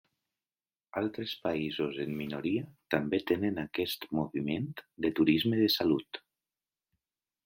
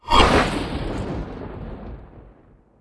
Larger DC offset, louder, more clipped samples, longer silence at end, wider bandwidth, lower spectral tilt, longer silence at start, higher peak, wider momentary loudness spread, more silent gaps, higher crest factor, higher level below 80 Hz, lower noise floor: neither; second, -32 LUFS vs -21 LUFS; neither; first, 1.3 s vs 0.6 s; first, 16.5 kHz vs 11 kHz; about the same, -6 dB/octave vs -5 dB/octave; first, 0.95 s vs 0.05 s; second, -10 dBFS vs 0 dBFS; second, 9 LU vs 23 LU; neither; about the same, 22 dB vs 22 dB; second, -66 dBFS vs -30 dBFS; first, under -90 dBFS vs -52 dBFS